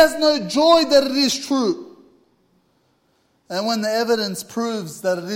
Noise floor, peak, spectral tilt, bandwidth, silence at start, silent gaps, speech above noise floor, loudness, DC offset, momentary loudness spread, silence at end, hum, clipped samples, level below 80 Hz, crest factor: -63 dBFS; 0 dBFS; -3.5 dB/octave; 16.5 kHz; 0 s; none; 45 dB; -19 LUFS; under 0.1%; 11 LU; 0 s; none; under 0.1%; -58 dBFS; 20 dB